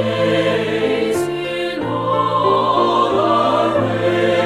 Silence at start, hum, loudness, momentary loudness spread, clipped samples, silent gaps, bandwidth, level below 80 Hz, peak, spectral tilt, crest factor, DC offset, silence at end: 0 s; none; -17 LUFS; 6 LU; under 0.1%; none; 15 kHz; -50 dBFS; -2 dBFS; -6 dB/octave; 14 dB; under 0.1%; 0 s